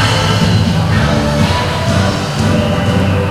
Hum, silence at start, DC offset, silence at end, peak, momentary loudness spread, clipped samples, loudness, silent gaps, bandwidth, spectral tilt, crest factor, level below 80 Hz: none; 0 s; under 0.1%; 0 s; 0 dBFS; 2 LU; under 0.1%; -13 LUFS; none; 15 kHz; -5.5 dB/octave; 12 dB; -28 dBFS